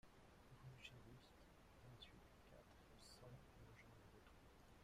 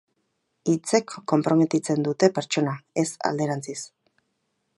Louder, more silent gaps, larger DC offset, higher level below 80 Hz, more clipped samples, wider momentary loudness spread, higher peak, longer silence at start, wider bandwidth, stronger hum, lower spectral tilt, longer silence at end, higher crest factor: second, -66 LUFS vs -24 LUFS; neither; neither; about the same, -74 dBFS vs -72 dBFS; neither; about the same, 8 LU vs 10 LU; second, -46 dBFS vs -4 dBFS; second, 0.05 s vs 0.65 s; first, 15.5 kHz vs 11.5 kHz; neither; about the same, -4.5 dB/octave vs -5.5 dB/octave; second, 0 s vs 0.9 s; about the same, 20 dB vs 22 dB